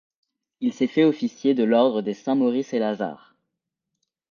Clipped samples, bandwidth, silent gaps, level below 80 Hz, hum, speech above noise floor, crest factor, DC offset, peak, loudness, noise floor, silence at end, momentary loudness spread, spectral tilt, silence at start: under 0.1%; 7 kHz; none; -76 dBFS; none; 60 dB; 18 dB; under 0.1%; -6 dBFS; -23 LUFS; -82 dBFS; 1.15 s; 9 LU; -6.5 dB/octave; 0.6 s